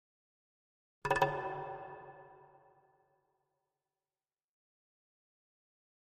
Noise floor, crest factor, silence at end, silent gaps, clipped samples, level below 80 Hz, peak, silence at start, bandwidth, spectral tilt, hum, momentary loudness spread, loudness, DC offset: under -90 dBFS; 30 dB; 3.75 s; none; under 0.1%; -68 dBFS; -14 dBFS; 1.05 s; 9 kHz; -5 dB/octave; none; 21 LU; -37 LUFS; under 0.1%